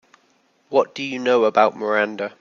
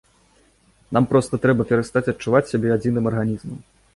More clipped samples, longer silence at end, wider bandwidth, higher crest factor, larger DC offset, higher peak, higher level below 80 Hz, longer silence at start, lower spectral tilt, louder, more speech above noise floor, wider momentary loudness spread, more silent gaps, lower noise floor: neither; second, 0.1 s vs 0.35 s; second, 7.2 kHz vs 11.5 kHz; about the same, 18 dB vs 18 dB; neither; about the same, -2 dBFS vs -4 dBFS; second, -72 dBFS vs -50 dBFS; second, 0.7 s vs 0.9 s; second, -4.5 dB/octave vs -7.5 dB/octave; about the same, -20 LUFS vs -20 LUFS; first, 42 dB vs 38 dB; about the same, 8 LU vs 8 LU; neither; first, -62 dBFS vs -58 dBFS